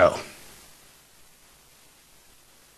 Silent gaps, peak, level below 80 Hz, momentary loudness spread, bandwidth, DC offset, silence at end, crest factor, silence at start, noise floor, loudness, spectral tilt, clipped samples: none; -4 dBFS; -60 dBFS; 17 LU; 13 kHz; under 0.1%; 2.5 s; 26 dB; 0 s; -55 dBFS; -27 LUFS; -4.5 dB/octave; under 0.1%